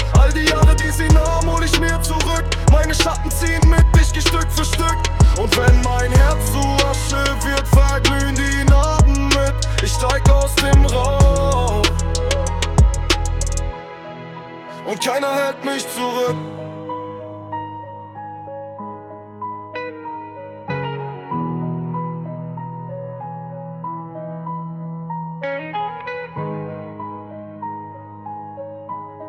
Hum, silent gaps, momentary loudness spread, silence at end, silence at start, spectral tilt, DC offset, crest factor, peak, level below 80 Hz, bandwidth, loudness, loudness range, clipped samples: none; none; 18 LU; 0 s; 0 s; -4.5 dB/octave; under 0.1%; 16 dB; -2 dBFS; -20 dBFS; 16 kHz; -18 LUFS; 14 LU; under 0.1%